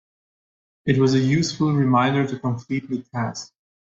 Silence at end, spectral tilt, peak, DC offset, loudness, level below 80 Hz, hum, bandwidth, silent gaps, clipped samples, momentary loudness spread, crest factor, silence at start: 0.45 s; -6.5 dB/octave; -4 dBFS; under 0.1%; -22 LUFS; -58 dBFS; none; 8 kHz; none; under 0.1%; 11 LU; 18 dB; 0.85 s